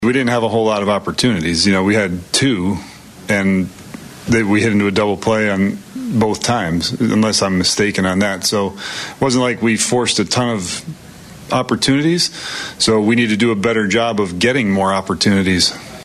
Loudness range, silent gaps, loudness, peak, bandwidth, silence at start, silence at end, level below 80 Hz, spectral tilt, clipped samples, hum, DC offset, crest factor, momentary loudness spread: 2 LU; none; -16 LUFS; -2 dBFS; 14.5 kHz; 0 s; 0 s; -46 dBFS; -4 dB/octave; under 0.1%; none; under 0.1%; 14 dB; 10 LU